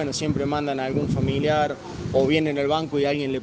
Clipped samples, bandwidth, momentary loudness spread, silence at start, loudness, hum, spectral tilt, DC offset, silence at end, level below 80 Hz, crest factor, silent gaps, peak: under 0.1%; 9.8 kHz; 4 LU; 0 s; -23 LUFS; none; -6 dB/octave; under 0.1%; 0 s; -46 dBFS; 16 dB; none; -6 dBFS